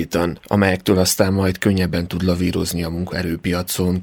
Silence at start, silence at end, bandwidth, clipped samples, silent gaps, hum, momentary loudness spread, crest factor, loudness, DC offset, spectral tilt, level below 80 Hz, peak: 0 s; 0 s; over 20 kHz; under 0.1%; none; none; 7 LU; 16 dB; -19 LUFS; under 0.1%; -5 dB/octave; -40 dBFS; -2 dBFS